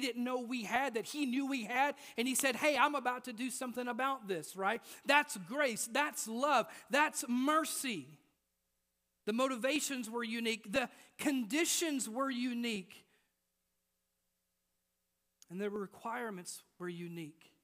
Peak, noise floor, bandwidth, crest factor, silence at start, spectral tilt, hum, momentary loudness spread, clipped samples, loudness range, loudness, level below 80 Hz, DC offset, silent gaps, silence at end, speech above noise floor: -14 dBFS; -84 dBFS; 15.5 kHz; 24 dB; 0 s; -2.5 dB/octave; none; 12 LU; under 0.1%; 12 LU; -35 LUFS; -82 dBFS; under 0.1%; none; 0.3 s; 48 dB